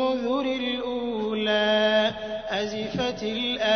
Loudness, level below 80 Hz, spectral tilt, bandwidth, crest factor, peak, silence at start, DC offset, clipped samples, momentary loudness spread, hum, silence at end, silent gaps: -25 LUFS; -54 dBFS; -4.5 dB/octave; 6.6 kHz; 14 dB; -10 dBFS; 0 s; under 0.1%; under 0.1%; 8 LU; none; 0 s; none